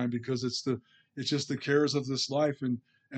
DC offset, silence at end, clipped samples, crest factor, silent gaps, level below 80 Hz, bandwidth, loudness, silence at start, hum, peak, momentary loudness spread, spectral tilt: under 0.1%; 0 s; under 0.1%; 18 dB; none; -76 dBFS; 9 kHz; -31 LUFS; 0 s; none; -14 dBFS; 10 LU; -5 dB/octave